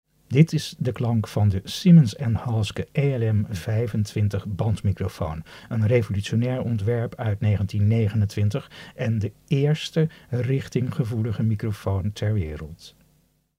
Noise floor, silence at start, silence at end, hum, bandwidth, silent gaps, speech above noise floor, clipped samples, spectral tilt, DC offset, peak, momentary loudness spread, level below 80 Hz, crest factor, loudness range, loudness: -64 dBFS; 0.3 s; 0.7 s; none; 13.5 kHz; none; 41 dB; under 0.1%; -7.5 dB/octave; under 0.1%; -4 dBFS; 8 LU; -48 dBFS; 18 dB; 4 LU; -24 LUFS